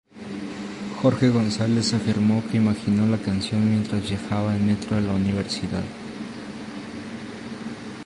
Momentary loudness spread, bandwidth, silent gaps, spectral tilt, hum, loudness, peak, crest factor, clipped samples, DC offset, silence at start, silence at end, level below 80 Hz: 14 LU; 11 kHz; none; -6.5 dB/octave; none; -23 LUFS; -6 dBFS; 18 dB; under 0.1%; under 0.1%; 0.15 s; 0 s; -48 dBFS